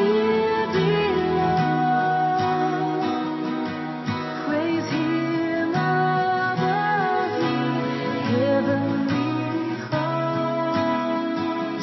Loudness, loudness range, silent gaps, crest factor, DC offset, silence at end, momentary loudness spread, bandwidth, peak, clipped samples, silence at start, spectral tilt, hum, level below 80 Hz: -23 LUFS; 2 LU; none; 12 dB; under 0.1%; 0 s; 5 LU; 6.2 kHz; -10 dBFS; under 0.1%; 0 s; -7 dB/octave; none; -54 dBFS